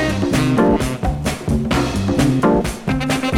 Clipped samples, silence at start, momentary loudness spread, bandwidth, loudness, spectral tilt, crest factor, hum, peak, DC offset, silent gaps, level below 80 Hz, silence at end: under 0.1%; 0 s; 6 LU; 17 kHz; -18 LUFS; -6 dB/octave; 14 dB; none; -4 dBFS; under 0.1%; none; -30 dBFS; 0 s